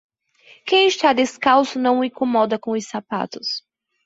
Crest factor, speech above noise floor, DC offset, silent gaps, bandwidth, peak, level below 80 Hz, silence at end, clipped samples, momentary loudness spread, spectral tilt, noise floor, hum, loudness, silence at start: 18 dB; 33 dB; under 0.1%; none; 8 kHz; -2 dBFS; -64 dBFS; 0.45 s; under 0.1%; 11 LU; -3.5 dB/octave; -52 dBFS; none; -19 LUFS; 0.65 s